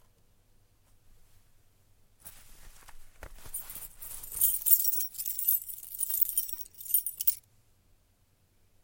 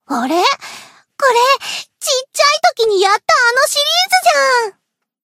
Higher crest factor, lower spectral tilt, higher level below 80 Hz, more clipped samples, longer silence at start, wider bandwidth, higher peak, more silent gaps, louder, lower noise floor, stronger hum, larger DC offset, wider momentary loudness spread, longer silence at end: first, 28 dB vs 14 dB; about the same, 1 dB/octave vs 0.5 dB/octave; first, -58 dBFS vs -70 dBFS; neither; first, 2.25 s vs 0.1 s; about the same, 17 kHz vs 16 kHz; second, -6 dBFS vs 0 dBFS; neither; second, -27 LUFS vs -13 LUFS; about the same, -68 dBFS vs -67 dBFS; neither; neither; first, 20 LU vs 8 LU; first, 1.45 s vs 0.55 s